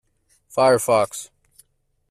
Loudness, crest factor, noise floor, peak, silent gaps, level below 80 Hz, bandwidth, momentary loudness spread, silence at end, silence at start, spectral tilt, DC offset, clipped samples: -19 LUFS; 18 dB; -64 dBFS; -4 dBFS; none; -62 dBFS; 15.5 kHz; 18 LU; 0.85 s; 0.55 s; -4 dB/octave; under 0.1%; under 0.1%